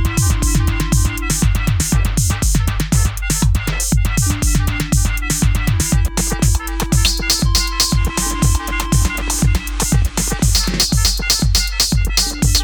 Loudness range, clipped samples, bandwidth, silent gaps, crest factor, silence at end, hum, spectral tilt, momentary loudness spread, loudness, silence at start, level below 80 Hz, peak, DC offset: 1 LU; under 0.1%; over 20 kHz; none; 16 dB; 0 s; none; -3.5 dB/octave; 4 LU; -16 LUFS; 0 s; -18 dBFS; 0 dBFS; under 0.1%